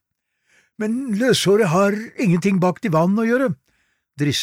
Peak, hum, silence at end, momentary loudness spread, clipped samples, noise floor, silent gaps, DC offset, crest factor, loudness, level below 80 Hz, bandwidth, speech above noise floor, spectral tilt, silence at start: -6 dBFS; none; 0 s; 9 LU; under 0.1%; -72 dBFS; none; under 0.1%; 14 dB; -19 LUFS; -62 dBFS; 16 kHz; 54 dB; -5.5 dB/octave; 0.8 s